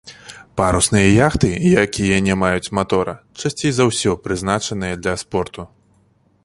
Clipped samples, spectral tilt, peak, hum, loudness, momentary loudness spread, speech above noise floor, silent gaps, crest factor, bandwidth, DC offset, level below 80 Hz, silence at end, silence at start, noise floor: under 0.1%; -5 dB/octave; -2 dBFS; none; -17 LUFS; 12 LU; 40 dB; none; 16 dB; 11.5 kHz; under 0.1%; -36 dBFS; 0.8 s; 0.05 s; -57 dBFS